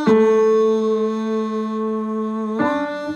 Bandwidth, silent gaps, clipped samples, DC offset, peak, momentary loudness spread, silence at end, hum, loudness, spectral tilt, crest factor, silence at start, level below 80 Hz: 7.2 kHz; none; under 0.1%; under 0.1%; -4 dBFS; 9 LU; 0 s; none; -19 LUFS; -7 dB/octave; 14 dB; 0 s; -66 dBFS